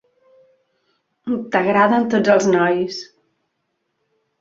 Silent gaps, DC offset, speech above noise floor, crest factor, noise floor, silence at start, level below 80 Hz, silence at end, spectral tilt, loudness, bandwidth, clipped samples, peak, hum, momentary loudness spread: none; under 0.1%; 56 dB; 18 dB; -73 dBFS; 1.25 s; -64 dBFS; 1.35 s; -5.5 dB/octave; -17 LUFS; 7.8 kHz; under 0.1%; -2 dBFS; none; 12 LU